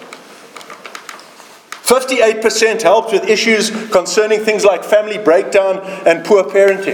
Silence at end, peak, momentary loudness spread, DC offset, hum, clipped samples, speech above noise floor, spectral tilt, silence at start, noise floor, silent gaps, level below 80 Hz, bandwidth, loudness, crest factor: 0 s; 0 dBFS; 19 LU; under 0.1%; none; under 0.1%; 27 dB; -2.5 dB/octave; 0 s; -39 dBFS; none; -58 dBFS; 19 kHz; -12 LUFS; 14 dB